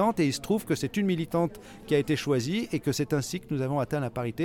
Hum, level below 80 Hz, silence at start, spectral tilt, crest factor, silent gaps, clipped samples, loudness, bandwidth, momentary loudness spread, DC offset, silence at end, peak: none; -56 dBFS; 0 s; -6 dB/octave; 16 dB; none; under 0.1%; -28 LUFS; 18.5 kHz; 5 LU; under 0.1%; 0 s; -12 dBFS